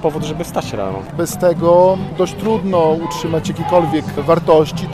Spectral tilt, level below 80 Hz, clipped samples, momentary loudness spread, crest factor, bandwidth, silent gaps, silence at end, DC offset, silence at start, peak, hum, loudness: -6.5 dB/octave; -42 dBFS; under 0.1%; 10 LU; 14 dB; 14.5 kHz; none; 0 s; under 0.1%; 0 s; 0 dBFS; none; -16 LUFS